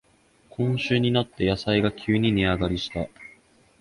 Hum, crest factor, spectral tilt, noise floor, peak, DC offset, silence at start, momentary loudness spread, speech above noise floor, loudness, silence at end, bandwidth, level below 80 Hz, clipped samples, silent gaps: none; 18 dB; -7 dB/octave; -60 dBFS; -8 dBFS; under 0.1%; 0.6 s; 9 LU; 36 dB; -24 LUFS; 0.55 s; 11.5 kHz; -44 dBFS; under 0.1%; none